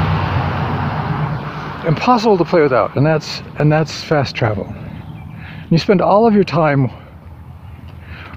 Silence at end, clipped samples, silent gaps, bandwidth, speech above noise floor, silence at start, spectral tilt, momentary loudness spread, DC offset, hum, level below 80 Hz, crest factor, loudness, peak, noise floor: 0 s; under 0.1%; none; 8 kHz; 21 dB; 0 s; -7 dB/octave; 21 LU; under 0.1%; none; -40 dBFS; 16 dB; -16 LUFS; 0 dBFS; -35 dBFS